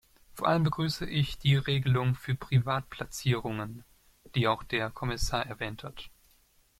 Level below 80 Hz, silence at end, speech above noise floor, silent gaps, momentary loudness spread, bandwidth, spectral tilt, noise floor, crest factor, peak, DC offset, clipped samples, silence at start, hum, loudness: -48 dBFS; 0.7 s; 36 dB; none; 15 LU; 15.5 kHz; -5.5 dB/octave; -65 dBFS; 18 dB; -12 dBFS; under 0.1%; under 0.1%; 0.35 s; none; -30 LUFS